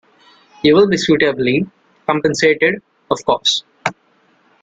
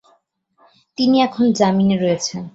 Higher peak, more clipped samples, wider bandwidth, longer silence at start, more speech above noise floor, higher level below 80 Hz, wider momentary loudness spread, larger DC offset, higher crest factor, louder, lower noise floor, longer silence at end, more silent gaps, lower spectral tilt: about the same, -2 dBFS vs -2 dBFS; neither; first, 9.2 kHz vs 8 kHz; second, 0.65 s vs 1 s; about the same, 42 dB vs 45 dB; first, -52 dBFS vs -58 dBFS; first, 12 LU vs 6 LU; neither; about the same, 16 dB vs 16 dB; about the same, -15 LUFS vs -17 LUFS; second, -56 dBFS vs -61 dBFS; first, 0.7 s vs 0.05 s; neither; about the same, -4.5 dB/octave vs -5.5 dB/octave